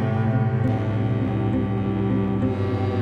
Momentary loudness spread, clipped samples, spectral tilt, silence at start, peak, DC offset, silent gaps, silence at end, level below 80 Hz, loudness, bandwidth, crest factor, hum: 2 LU; under 0.1%; -10 dB/octave; 0 s; -10 dBFS; under 0.1%; none; 0 s; -42 dBFS; -23 LUFS; 5 kHz; 12 dB; none